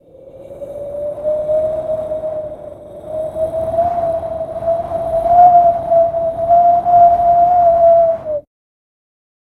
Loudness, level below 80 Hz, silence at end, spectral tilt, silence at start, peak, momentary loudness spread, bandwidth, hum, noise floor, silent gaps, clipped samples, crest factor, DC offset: -14 LUFS; -42 dBFS; 1.05 s; -8 dB/octave; 0.25 s; 0 dBFS; 17 LU; 4 kHz; none; -38 dBFS; none; under 0.1%; 14 dB; under 0.1%